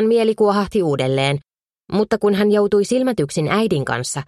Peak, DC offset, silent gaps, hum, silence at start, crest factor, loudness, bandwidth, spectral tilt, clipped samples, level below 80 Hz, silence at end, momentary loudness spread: -4 dBFS; under 0.1%; none; none; 0 s; 14 dB; -18 LUFS; 13 kHz; -5.5 dB/octave; under 0.1%; -50 dBFS; 0.05 s; 6 LU